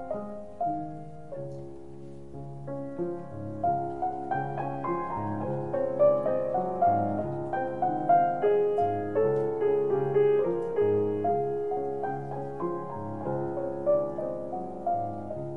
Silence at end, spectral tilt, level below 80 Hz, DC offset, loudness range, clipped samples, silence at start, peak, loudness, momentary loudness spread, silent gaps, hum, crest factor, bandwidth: 0 s; -9.5 dB/octave; -60 dBFS; 0.6%; 9 LU; under 0.1%; 0 s; -12 dBFS; -29 LUFS; 15 LU; none; none; 16 dB; 3.6 kHz